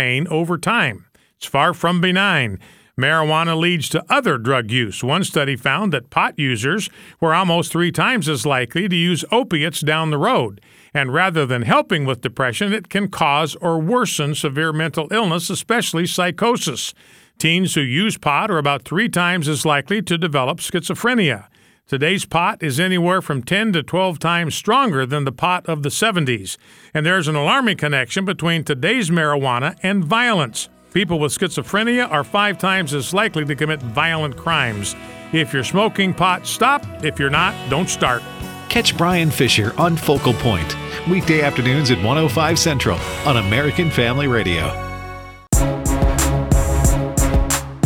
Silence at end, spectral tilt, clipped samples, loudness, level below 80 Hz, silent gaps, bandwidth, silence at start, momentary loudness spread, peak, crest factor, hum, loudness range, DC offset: 0 s; -4.5 dB/octave; under 0.1%; -18 LUFS; -32 dBFS; none; 17.5 kHz; 0 s; 6 LU; 0 dBFS; 18 dB; none; 2 LU; under 0.1%